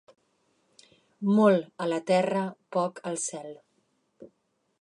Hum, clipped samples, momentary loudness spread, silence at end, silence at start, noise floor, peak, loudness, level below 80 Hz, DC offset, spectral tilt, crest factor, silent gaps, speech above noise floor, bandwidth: none; under 0.1%; 12 LU; 0.55 s; 1.2 s; -74 dBFS; -8 dBFS; -27 LUFS; -82 dBFS; under 0.1%; -5.5 dB/octave; 20 dB; none; 48 dB; 11 kHz